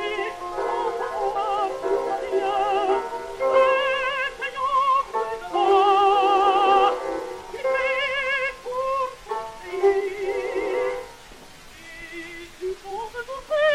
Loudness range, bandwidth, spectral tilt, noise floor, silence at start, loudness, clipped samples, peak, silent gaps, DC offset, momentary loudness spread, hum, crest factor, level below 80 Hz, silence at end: 7 LU; 14 kHz; -3 dB/octave; -44 dBFS; 0 s; -23 LUFS; under 0.1%; -6 dBFS; none; under 0.1%; 15 LU; none; 18 dB; -52 dBFS; 0 s